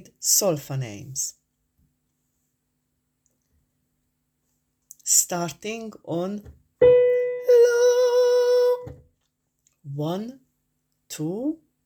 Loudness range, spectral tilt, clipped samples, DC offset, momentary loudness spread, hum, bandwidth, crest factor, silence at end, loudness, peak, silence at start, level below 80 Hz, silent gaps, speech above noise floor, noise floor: 15 LU; -3.5 dB/octave; under 0.1%; under 0.1%; 16 LU; none; 18.5 kHz; 20 dB; 0.3 s; -21 LUFS; -4 dBFS; 0.2 s; -60 dBFS; none; 49 dB; -75 dBFS